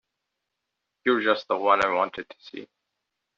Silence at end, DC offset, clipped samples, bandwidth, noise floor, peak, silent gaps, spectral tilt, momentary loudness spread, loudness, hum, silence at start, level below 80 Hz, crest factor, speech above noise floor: 0.75 s; under 0.1%; under 0.1%; 7.4 kHz; -83 dBFS; -6 dBFS; none; -1 dB/octave; 20 LU; -24 LUFS; none; 1.05 s; -66 dBFS; 22 dB; 58 dB